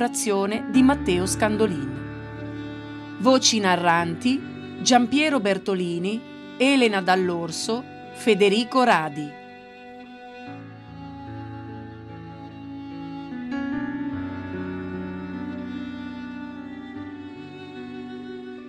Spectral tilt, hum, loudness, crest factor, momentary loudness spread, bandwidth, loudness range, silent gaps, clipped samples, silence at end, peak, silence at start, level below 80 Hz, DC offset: -4 dB/octave; none; -23 LUFS; 20 dB; 20 LU; 13.5 kHz; 15 LU; none; under 0.1%; 0 s; -6 dBFS; 0 s; -52 dBFS; under 0.1%